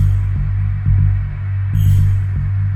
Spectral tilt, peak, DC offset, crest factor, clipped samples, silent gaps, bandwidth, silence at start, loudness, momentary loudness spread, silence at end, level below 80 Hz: -8.5 dB/octave; -4 dBFS; under 0.1%; 10 dB; under 0.1%; none; 13.5 kHz; 0 s; -17 LUFS; 6 LU; 0 s; -22 dBFS